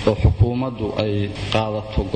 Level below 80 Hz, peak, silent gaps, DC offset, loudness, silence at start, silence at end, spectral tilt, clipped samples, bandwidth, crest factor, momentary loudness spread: -28 dBFS; -6 dBFS; none; under 0.1%; -21 LUFS; 0 s; 0 s; -7.5 dB/octave; under 0.1%; 9.2 kHz; 14 dB; 7 LU